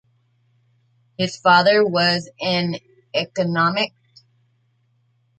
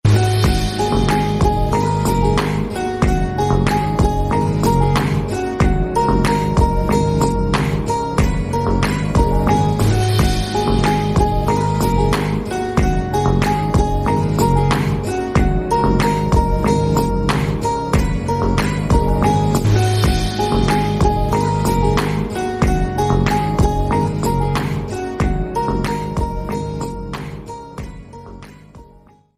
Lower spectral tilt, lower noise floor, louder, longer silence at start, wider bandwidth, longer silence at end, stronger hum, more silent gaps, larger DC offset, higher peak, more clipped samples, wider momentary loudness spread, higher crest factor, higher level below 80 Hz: second, -5 dB/octave vs -6.5 dB/octave; first, -64 dBFS vs -47 dBFS; about the same, -19 LUFS vs -17 LUFS; first, 1.2 s vs 0.05 s; second, 8.8 kHz vs 16 kHz; first, 1.5 s vs 0.55 s; neither; neither; neither; about the same, -2 dBFS vs -2 dBFS; neither; first, 12 LU vs 6 LU; first, 20 dB vs 14 dB; second, -66 dBFS vs -24 dBFS